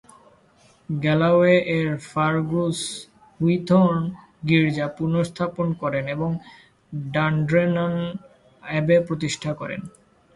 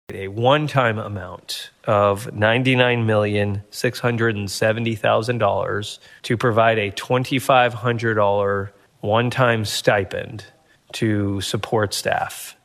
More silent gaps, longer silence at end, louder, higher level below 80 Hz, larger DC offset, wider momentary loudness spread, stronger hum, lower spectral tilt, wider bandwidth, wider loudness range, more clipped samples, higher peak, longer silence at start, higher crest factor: neither; first, 0.45 s vs 0.1 s; about the same, -22 LUFS vs -20 LUFS; about the same, -56 dBFS vs -58 dBFS; neither; about the same, 14 LU vs 13 LU; neither; first, -6.5 dB/octave vs -5 dB/octave; second, 11.5 kHz vs 14 kHz; about the same, 4 LU vs 2 LU; neither; about the same, -4 dBFS vs -2 dBFS; first, 0.9 s vs 0.1 s; about the same, 18 dB vs 18 dB